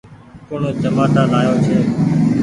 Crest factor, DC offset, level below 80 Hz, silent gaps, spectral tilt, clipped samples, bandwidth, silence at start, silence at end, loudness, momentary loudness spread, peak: 14 dB; under 0.1%; -44 dBFS; none; -8 dB/octave; under 0.1%; 11 kHz; 0.1 s; 0 s; -15 LUFS; 8 LU; -2 dBFS